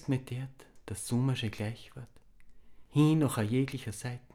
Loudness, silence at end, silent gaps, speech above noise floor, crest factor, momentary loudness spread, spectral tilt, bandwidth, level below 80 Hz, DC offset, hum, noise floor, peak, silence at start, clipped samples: -32 LUFS; 0.15 s; none; 20 dB; 18 dB; 20 LU; -6.5 dB/octave; 16 kHz; -62 dBFS; under 0.1%; none; -51 dBFS; -14 dBFS; 0 s; under 0.1%